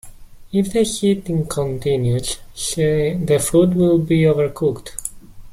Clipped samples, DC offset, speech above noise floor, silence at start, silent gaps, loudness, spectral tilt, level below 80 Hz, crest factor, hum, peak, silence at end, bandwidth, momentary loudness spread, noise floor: under 0.1%; under 0.1%; 20 dB; 0.05 s; none; -18 LUFS; -6 dB/octave; -40 dBFS; 16 dB; none; -2 dBFS; 0 s; 16 kHz; 10 LU; -38 dBFS